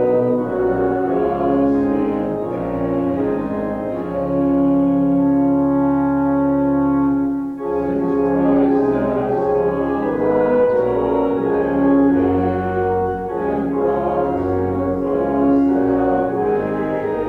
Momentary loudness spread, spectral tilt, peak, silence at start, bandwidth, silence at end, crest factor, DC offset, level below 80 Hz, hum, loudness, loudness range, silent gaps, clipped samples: 6 LU; -10 dB/octave; -4 dBFS; 0 s; 4 kHz; 0 s; 12 dB; under 0.1%; -42 dBFS; none; -18 LUFS; 2 LU; none; under 0.1%